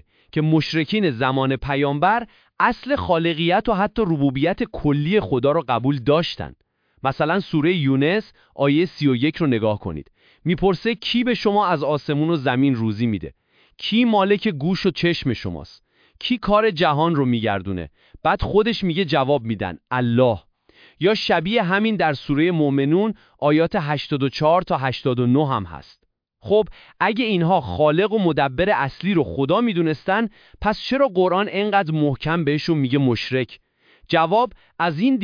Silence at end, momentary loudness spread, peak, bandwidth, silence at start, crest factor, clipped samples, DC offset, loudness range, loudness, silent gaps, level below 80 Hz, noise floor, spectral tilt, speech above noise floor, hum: 0 s; 7 LU; -2 dBFS; 5.2 kHz; 0.35 s; 18 dB; under 0.1%; under 0.1%; 2 LU; -20 LUFS; none; -46 dBFS; -53 dBFS; -7.5 dB/octave; 34 dB; none